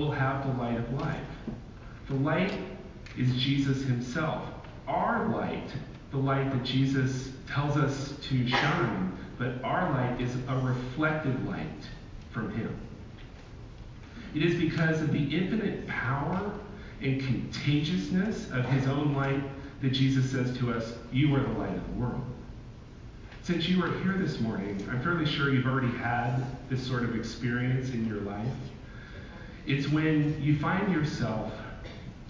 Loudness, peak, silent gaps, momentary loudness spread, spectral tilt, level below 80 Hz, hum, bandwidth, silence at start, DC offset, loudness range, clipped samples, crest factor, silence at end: -30 LUFS; -14 dBFS; none; 17 LU; -7 dB/octave; -48 dBFS; none; 7.6 kHz; 0 s; under 0.1%; 4 LU; under 0.1%; 16 dB; 0 s